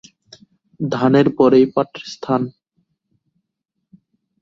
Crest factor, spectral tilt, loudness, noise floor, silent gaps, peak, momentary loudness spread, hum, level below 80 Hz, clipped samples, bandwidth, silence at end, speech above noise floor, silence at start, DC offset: 18 dB; -7.5 dB/octave; -17 LUFS; -77 dBFS; none; -2 dBFS; 15 LU; none; -60 dBFS; under 0.1%; 7.4 kHz; 1.9 s; 61 dB; 0.8 s; under 0.1%